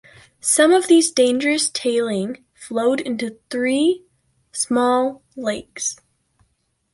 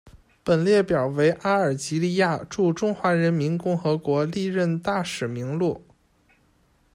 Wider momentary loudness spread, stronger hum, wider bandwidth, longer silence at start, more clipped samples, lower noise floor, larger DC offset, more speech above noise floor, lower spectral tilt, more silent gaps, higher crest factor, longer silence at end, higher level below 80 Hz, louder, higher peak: first, 14 LU vs 7 LU; neither; about the same, 11.5 kHz vs 12.5 kHz; first, 0.45 s vs 0.05 s; neither; first, -68 dBFS vs -62 dBFS; neither; first, 49 dB vs 40 dB; second, -2.5 dB/octave vs -6.5 dB/octave; neither; about the same, 18 dB vs 16 dB; second, 1 s vs 1.15 s; second, -64 dBFS vs -58 dBFS; first, -19 LUFS vs -23 LUFS; first, -2 dBFS vs -8 dBFS